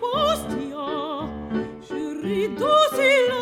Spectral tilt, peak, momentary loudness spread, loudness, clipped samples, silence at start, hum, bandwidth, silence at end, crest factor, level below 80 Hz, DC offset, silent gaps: -4 dB/octave; -6 dBFS; 13 LU; -23 LUFS; under 0.1%; 0 s; none; 18 kHz; 0 s; 16 dB; -48 dBFS; under 0.1%; none